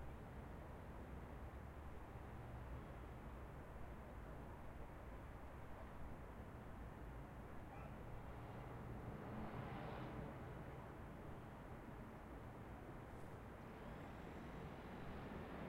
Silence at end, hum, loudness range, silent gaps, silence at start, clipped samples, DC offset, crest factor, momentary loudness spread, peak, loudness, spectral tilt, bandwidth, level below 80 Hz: 0 s; none; 3 LU; none; 0 s; under 0.1%; under 0.1%; 14 dB; 5 LU; -38 dBFS; -55 LUFS; -7.5 dB/octave; 16 kHz; -60 dBFS